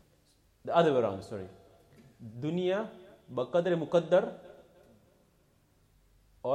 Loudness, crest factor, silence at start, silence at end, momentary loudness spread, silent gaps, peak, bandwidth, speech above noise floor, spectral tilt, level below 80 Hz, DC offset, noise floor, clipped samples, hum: -30 LUFS; 22 dB; 0.65 s; 0 s; 21 LU; none; -12 dBFS; 10 kHz; 38 dB; -7 dB/octave; -70 dBFS; under 0.1%; -67 dBFS; under 0.1%; none